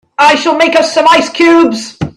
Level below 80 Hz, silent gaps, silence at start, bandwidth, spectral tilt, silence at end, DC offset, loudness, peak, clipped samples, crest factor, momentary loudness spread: -46 dBFS; none; 0.2 s; 12 kHz; -4 dB/octave; 0.05 s; under 0.1%; -8 LUFS; 0 dBFS; 0.1%; 8 dB; 3 LU